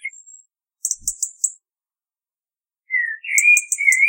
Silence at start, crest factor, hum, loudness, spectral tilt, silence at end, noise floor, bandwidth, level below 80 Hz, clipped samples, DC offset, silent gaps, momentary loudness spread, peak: 0.05 s; 22 dB; none; -17 LUFS; 5.5 dB/octave; 0 s; under -90 dBFS; 17 kHz; -60 dBFS; under 0.1%; under 0.1%; none; 12 LU; 0 dBFS